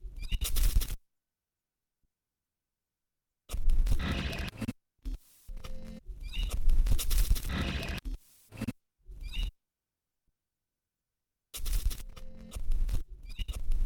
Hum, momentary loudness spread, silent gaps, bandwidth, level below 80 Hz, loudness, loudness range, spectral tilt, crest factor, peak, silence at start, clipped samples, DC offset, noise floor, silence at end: none; 16 LU; none; 19.5 kHz; -32 dBFS; -36 LUFS; 8 LU; -4 dB/octave; 18 dB; -14 dBFS; 0 s; under 0.1%; under 0.1%; under -90 dBFS; 0 s